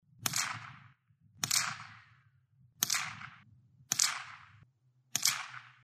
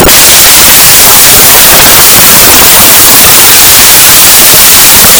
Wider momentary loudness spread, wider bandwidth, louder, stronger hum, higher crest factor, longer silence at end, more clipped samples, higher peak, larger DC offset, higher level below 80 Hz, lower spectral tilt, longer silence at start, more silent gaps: first, 20 LU vs 0 LU; second, 15.5 kHz vs over 20 kHz; second, -33 LUFS vs 3 LUFS; neither; first, 34 dB vs 0 dB; first, 0.15 s vs 0 s; second, under 0.1% vs 100%; second, -6 dBFS vs 0 dBFS; neither; second, -80 dBFS vs -22 dBFS; about the same, 0.5 dB/octave vs -0.5 dB/octave; first, 0.2 s vs 0 s; neither